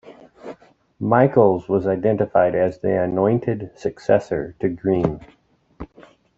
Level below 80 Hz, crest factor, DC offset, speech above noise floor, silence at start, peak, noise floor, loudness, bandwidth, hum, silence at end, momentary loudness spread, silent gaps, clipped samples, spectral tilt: -52 dBFS; 20 dB; under 0.1%; 31 dB; 0.05 s; -2 dBFS; -50 dBFS; -20 LUFS; 7.8 kHz; none; 0.5 s; 23 LU; none; under 0.1%; -9 dB/octave